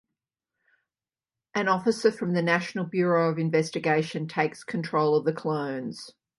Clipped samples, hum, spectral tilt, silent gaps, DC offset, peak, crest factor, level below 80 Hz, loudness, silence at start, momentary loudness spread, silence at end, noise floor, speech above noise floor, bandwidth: under 0.1%; none; -6 dB/octave; none; under 0.1%; -8 dBFS; 20 dB; -74 dBFS; -26 LUFS; 1.55 s; 9 LU; 0.3 s; under -90 dBFS; over 64 dB; 11.5 kHz